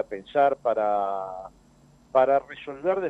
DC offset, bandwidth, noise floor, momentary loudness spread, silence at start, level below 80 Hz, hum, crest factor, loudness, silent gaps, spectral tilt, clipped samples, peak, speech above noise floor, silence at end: under 0.1%; 7.8 kHz; -56 dBFS; 15 LU; 0 s; -62 dBFS; none; 18 dB; -25 LUFS; none; -6.5 dB/octave; under 0.1%; -6 dBFS; 32 dB; 0 s